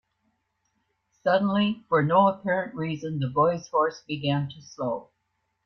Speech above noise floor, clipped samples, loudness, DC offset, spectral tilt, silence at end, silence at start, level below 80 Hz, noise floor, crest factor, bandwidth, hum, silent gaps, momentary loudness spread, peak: 51 dB; under 0.1%; -25 LUFS; under 0.1%; -7 dB/octave; 0.65 s; 1.25 s; -66 dBFS; -76 dBFS; 18 dB; 6.6 kHz; none; none; 10 LU; -8 dBFS